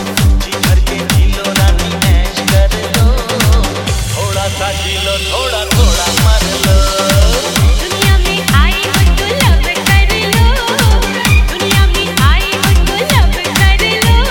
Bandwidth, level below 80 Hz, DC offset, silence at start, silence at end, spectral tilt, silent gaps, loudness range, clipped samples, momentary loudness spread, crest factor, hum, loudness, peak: 18 kHz; -14 dBFS; under 0.1%; 0 s; 0 s; -4 dB/octave; none; 2 LU; under 0.1%; 4 LU; 10 dB; none; -11 LUFS; 0 dBFS